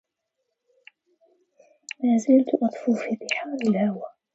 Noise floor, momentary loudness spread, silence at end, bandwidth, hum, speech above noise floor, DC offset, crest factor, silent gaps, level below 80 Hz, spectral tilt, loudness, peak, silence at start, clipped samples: -79 dBFS; 9 LU; 0.25 s; 8 kHz; none; 57 dB; under 0.1%; 18 dB; none; -76 dBFS; -6 dB/octave; -23 LUFS; -6 dBFS; 2 s; under 0.1%